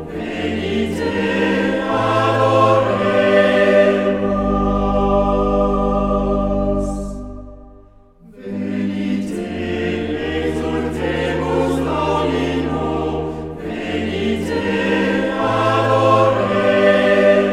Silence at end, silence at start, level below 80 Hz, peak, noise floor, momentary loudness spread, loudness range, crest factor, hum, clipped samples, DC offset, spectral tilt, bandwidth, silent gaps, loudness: 0 s; 0 s; -32 dBFS; -2 dBFS; -45 dBFS; 11 LU; 8 LU; 16 dB; none; under 0.1%; under 0.1%; -6.5 dB/octave; 13 kHz; none; -17 LUFS